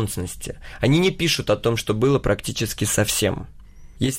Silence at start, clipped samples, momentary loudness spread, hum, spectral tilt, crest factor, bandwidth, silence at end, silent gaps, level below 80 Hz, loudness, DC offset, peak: 0 s; under 0.1%; 12 LU; none; -4.5 dB/octave; 14 dB; 16.5 kHz; 0 s; none; -40 dBFS; -21 LUFS; under 0.1%; -8 dBFS